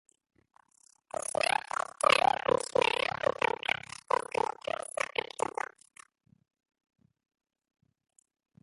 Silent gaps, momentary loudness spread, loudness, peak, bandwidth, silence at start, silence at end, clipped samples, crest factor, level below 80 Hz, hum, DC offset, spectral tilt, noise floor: none; 11 LU; -31 LUFS; -8 dBFS; 12 kHz; 1.4 s; 4.9 s; under 0.1%; 26 dB; -68 dBFS; none; under 0.1%; -2 dB/octave; -66 dBFS